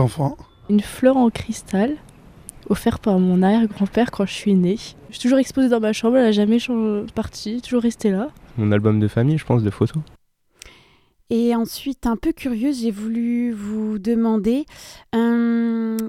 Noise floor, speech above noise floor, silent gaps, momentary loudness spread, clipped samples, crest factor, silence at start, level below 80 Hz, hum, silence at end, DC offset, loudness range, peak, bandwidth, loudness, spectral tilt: -56 dBFS; 36 dB; none; 10 LU; under 0.1%; 16 dB; 0 s; -46 dBFS; none; 0 s; under 0.1%; 4 LU; -2 dBFS; 15 kHz; -20 LUFS; -7 dB/octave